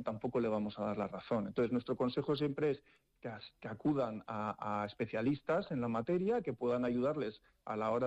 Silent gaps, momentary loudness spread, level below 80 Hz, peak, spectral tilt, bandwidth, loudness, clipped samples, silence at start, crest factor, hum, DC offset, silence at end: none; 10 LU; -70 dBFS; -26 dBFS; -8.5 dB/octave; 8 kHz; -37 LUFS; under 0.1%; 0 s; 12 dB; none; under 0.1%; 0 s